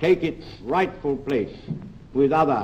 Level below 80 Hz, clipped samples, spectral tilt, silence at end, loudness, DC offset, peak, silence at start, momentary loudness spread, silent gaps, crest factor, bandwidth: -48 dBFS; under 0.1%; -7.5 dB/octave; 0 s; -24 LUFS; under 0.1%; -8 dBFS; 0 s; 15 LU; none; 16 dB; 8.4 kHz